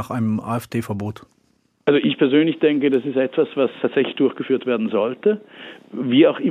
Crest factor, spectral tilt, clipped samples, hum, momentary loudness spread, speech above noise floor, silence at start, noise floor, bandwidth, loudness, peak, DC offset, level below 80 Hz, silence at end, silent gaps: 16 dB; -7 dB/octave; under 0.1%; none; 12 LU; 43 dB; 0 s; -63 dBFS; 14.5 kHz; -20 LUFS; -4 dBFS; under 0.1%; -68 dBFS; 0 s; none